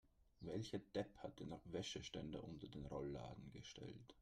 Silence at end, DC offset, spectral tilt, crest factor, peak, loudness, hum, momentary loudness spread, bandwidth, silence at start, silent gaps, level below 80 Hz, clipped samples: 0 s; under 0.1%; -5.5 dB/octave; 20 dB; -32 dBFS; -52 LUFS; none; 8 LU; 13.5 kHz; 0.05 s; none; -68 dBFS; under 0.1%